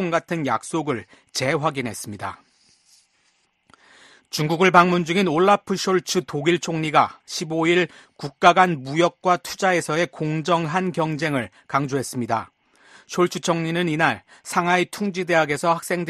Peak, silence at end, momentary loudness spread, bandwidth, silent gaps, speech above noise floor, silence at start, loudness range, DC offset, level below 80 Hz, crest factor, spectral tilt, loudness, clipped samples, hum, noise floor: 0 dBFS; 0 s; 11 LU; 13.5 kHz; none; 44 dB; 0 s; 7 LU; under 0.1%; -62 dBFS; 22 dB; -5 dB/octave; -21 LUFS; under 0.1%; none; -66 dBFS